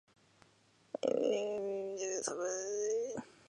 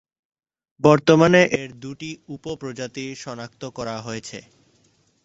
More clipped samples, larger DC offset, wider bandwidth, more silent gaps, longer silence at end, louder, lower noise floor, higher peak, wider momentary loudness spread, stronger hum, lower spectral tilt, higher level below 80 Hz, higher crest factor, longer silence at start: neither; neither; first, 11 kHz vs 8 kHz; neither; second, 0.2 s vs 0.85 s; second, -37 LUFS vs -20 LUFS; first, -69 dBFS vs -62 dBFS; second, -18 dBFS vs -2 dBFS; second, 6 LU vs 20 LU; neither; second, -3 dB/octave vs -5.5 dB/octave; second, -84 dBFS vs -58 dBFS; about the same, 20 dB vs 20 dB; first, 1.05 s vs 0.85 s